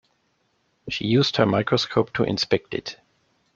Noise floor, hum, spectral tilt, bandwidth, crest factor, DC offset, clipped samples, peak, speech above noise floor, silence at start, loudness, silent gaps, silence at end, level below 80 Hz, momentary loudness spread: -69 dBFS; none; -5.5 dB/octave; 7.6 kHz; 22 dB; under 0.1%; under 0.1%; -2 dBFS; 46 dB; 0.85 s; -22 LUFS; none; 0.6 s; -56 dBFS; 12 LU